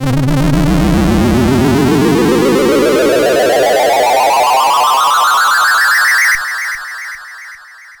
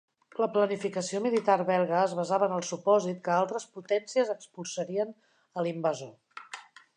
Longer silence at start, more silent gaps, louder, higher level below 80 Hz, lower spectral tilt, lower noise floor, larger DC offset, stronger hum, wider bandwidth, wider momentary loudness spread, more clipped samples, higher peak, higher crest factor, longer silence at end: second, 0 s vs 0.35 s; neither; first, -10 LUFS vs -29 LUFS; first, -26 dBFS vs -82 dBFS; about the same, -4.5 dB/octave vs -5 dB/octave; second, -35 dBFS vs -48 dBFS; neither; neither; first, 19.5 kHz vs 10.5 kHz; second, 10 LU vs 16 LU; neither; first, 0 dBFS vs -12 dBFS; second, 10 dB vs 18 dB; about the same, 0.45 s vs 0.35 s